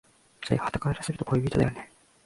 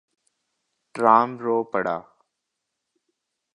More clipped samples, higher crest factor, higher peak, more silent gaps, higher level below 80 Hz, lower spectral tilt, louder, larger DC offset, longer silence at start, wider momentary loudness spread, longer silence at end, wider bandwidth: neither; about the same, 20 dB vs 24 dB; second, -8 dBFS vs -2 dBFS; neither; first, -48 dBFS vs -72 dBFS; about the same, -6.5 dB/octave vs -7 dB/octave; second, -28 LUFS vs -22 LUFS; neither; second, 0.4 s vs 0.95 s; about the same, 16 LU vs 14 LU; second, 0.4 s vs 1.55 s; about the same, 11.5 kHz vs 11 kHz